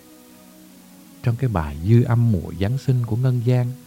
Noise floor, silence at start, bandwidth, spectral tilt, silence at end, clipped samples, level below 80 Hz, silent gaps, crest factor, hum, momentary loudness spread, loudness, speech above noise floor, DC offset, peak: -46 dBFS; 1.25 s; 15.5 kHz; -8.5 dB/octave; 0.05 s; under 0.1%; -42 dBFS; none; 18 dB; none; 7 LU; -21 LUFS; 27 dB; under 0.1%; -4 dBFS